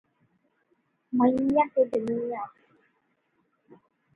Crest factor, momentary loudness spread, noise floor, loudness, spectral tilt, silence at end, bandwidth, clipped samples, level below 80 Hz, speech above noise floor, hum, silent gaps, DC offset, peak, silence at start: 20 dB; 12 LU; -73 dBFS; -26 LUFS; -8.5 dB/octave; 1.65 s; 5.2 kHz; under 0.1%; -66 dBFS; 48 dB; none; none; under 0.1%; -10 dBFS; 1.1 s